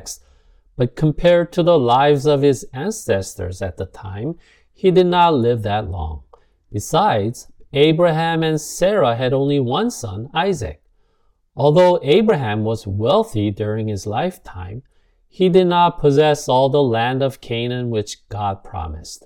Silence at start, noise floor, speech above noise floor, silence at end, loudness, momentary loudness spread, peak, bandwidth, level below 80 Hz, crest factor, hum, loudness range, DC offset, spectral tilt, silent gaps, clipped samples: 0 s; -60 dBFS; 43 dB; 0.1 s; -17 LUFS; 16 LU; -2 dBFS; 17.5 kHz; -42 dBFS; 16 dB; none; 3 LU; under 0.1%; -6 dB/octave; none; under 0.1%